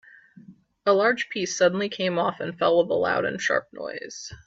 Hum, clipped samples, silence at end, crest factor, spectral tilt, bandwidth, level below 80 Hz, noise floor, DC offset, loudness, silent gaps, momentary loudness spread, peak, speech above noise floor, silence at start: none; under 0.1%; 0.1 s; 18 dB; -4 dB/octave; 7.8 kHz; -64 dBFS; -50 dBFS; under 0.1%; -24 LUFS; none; 13 LU; -8 dBFS; 26 dB; 0.35 s